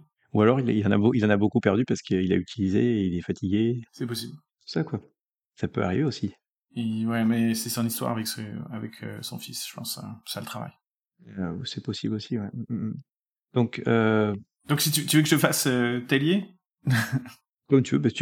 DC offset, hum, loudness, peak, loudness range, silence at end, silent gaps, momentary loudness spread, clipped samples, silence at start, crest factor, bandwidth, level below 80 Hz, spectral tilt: under 0.1%; none; -26 LUFS; -4 dBFS; 10 LU; 0 s; 5.21-5.50 s, 6.49-6.67 s, 10.87-11.11 s, 13.11-13.28 s, 13.38-13.44 s, 16.66-16.78 s, 17.49-17.59 s; 14 LU; under 0.1%; 0.35 s; 22 dB; 18 kHz; -64 dBFS; -5.5 dB/octave